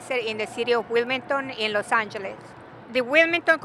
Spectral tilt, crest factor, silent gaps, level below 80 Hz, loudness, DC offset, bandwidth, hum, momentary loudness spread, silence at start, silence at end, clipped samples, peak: -3.5 dB/octave; 20 dB; none; -70 dBFS; -23 LUFS; under 0.1%; 12 kHz; none; 15 LU; 0 s; 0 s; under 0.1%; -4 dBFS